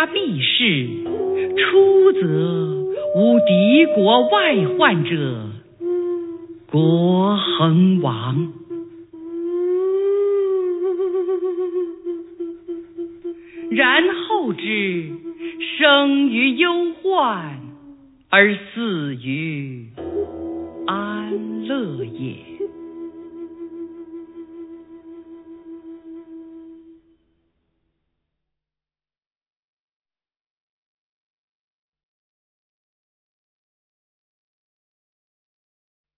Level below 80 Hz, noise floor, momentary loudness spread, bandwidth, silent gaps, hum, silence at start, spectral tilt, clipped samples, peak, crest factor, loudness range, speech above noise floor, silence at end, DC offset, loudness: -62 dBFS; under -90 dBFS; 21 LU; 4.1 kHz; none; none; 0 s; -9.5 dB/octave; under 0.1%; 0 dBFS; 20 dB; 18 LU; over 73 dB; 9.25 s; under 0.1%; -18 LUFS